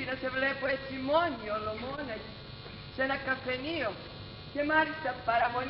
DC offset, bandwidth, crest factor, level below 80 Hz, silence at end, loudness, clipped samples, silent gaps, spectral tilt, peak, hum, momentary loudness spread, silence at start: under 0.1%; 5.8 kHz; 18 dB; -56 dBFS; 0 s; -32 LUFS; under 0.1%; none; -2.5 dB/octave; -14 dBFS; 50 Hz at -60 dBFS; 16 LU; 0 s